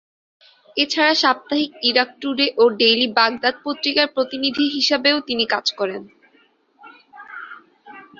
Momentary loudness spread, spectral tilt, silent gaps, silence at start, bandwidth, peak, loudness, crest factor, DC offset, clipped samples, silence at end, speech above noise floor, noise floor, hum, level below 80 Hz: 13 LU; -2.5 dB/octave; none; 0.75 s; 7.6 kHz; -2 dBFS; -18 LUFS; 20 dB; under 0.1%; under 0.1%; 0.15 s; 39 dB; -58 dBFS; none; -66 dBFS